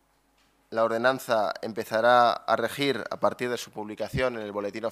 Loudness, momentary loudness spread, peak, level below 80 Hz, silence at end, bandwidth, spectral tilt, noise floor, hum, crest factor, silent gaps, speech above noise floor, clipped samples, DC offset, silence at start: -26 LUFS; 12 LU; -6 dBFS; -56 dBFS; 0 s; 15.5 kHz; -4.5 dB/octave; -66 dBFS; none; 20 dB; none; 40 dB; under 0.1%; under 0.1%; 0.7 s